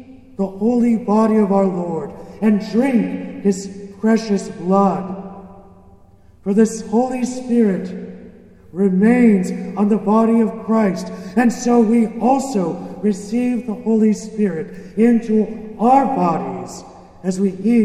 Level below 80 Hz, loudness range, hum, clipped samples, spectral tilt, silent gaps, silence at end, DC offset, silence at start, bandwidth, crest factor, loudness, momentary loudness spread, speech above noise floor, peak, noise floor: -52 dBFS; 4 LU; none; under 0.1%; -7 dB/octave; none; 0 s; under 0.1%; 0 s; 11 kHz; 16 dB; -17 LUFS; 13 LU; 31 dB; 0 dBFS; -47 dBFS